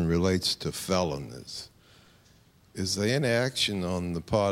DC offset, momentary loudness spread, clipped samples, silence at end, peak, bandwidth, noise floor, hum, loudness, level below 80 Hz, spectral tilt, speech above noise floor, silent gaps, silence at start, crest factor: under 0.1%; 14 LU; under 0.1%; 0 s; -12 dBFS; 16 kHz; -60 dBFS; none; -28 LUFS; -52 dBFS; -4.5 dB/octave; 32 dB; none; 0 s; 18 dB